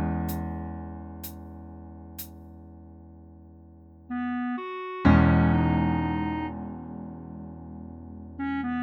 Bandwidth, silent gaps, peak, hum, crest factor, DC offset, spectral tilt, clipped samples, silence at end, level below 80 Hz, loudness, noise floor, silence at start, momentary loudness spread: 19.5 kHz; none; -6 dBFS; none; 22 dB; under 0.1%; -8 dB/octave; under 0.1%; 0 s; -40 dBFS; -27 LUFS; -50 dBFS; 0 s; 24 LU